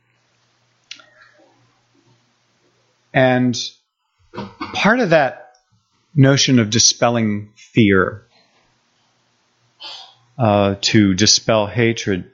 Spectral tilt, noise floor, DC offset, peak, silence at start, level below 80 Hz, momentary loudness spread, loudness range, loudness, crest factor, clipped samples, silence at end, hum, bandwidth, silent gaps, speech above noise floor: -4 dB/octave; -62 dBFS; under 0.1%; 0 dBFS; 3.15 s; -56 dBFS; 21 LU; 7 LU; -15 LUFS; 18 dB; under 0.1%; 0.1 s; none; 7.6 kHz; none; 47 dB